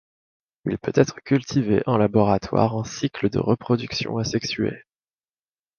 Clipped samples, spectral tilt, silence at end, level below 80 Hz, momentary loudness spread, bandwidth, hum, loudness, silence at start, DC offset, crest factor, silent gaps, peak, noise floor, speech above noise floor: under 0.1%; -6.5 dB/octave; 1 s; -50 dBFS; 8 LU; 7 kHz; none; -23 LUFS; 0.65 s; under 0.1%; 22 dB; none; -2 dBFS; under -90 dBFS; over 68 dB